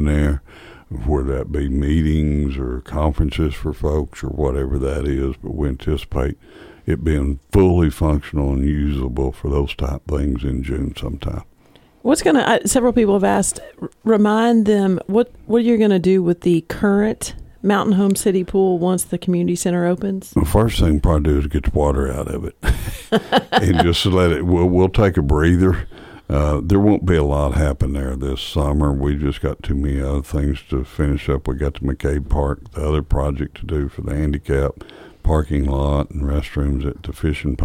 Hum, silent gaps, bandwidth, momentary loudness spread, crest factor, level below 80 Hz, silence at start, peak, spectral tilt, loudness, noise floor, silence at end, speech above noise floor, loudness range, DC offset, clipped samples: none; none; 16 kHz; 9 LU; 16 dB; -24 dBFS; 0 s; 0 dBFS; -6.5 dB/octave; -19 LUFS; -51 dBFS; 0 s; 33 dB; 6 LU; under 0.1%; under 0.1%